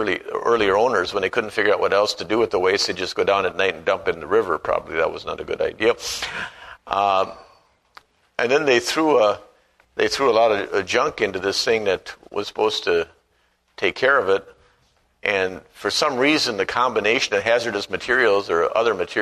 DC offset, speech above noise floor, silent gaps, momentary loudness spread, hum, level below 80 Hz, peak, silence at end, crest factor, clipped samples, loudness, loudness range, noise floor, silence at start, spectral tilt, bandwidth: under 0.1%; 44 dB; none; 9 LU; none; -54 dBFS; -2 dBFS; 0 s; 20 dB; under 0.1%; -20 LUFS; 4 LU; -64 dBFS; 0 s; -3 dB/octave; 13.5 kHz